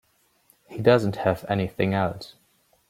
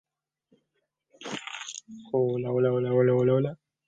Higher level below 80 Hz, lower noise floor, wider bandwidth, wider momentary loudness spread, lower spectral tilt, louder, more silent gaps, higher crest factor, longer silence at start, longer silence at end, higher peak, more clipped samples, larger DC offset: first, -58 dBFS vs -70 dBFS; second, -63 dBFS vs -79 dBFS; first, 16.5 kHz vs 9 kHz; first, 20 LU vs 16 LU; about the same, -7.5 dB/octave vs -6.5 dB/octave; about the same, -24 LUFS vs -26 LUFS; neither; about the same, 20 dB vs 18 dB; second, 0.7 s vs 1.2 s; first, 0.6 s vs 0.35 s; first, -4 dBFS vs -10 dBFS; neither; neither